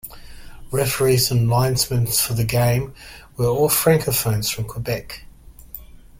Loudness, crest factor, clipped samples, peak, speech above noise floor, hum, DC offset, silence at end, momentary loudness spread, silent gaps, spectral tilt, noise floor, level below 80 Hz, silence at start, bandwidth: -19 LUFS; 18 dB; under 0.1%; -4 dBFS; 21 dB; none; under 0.1%; 0.25 s; 21 LU; none; -4.5 dB/octave; -41 dBFS; -42 dBFS; 0.05 s; 16.5 kHz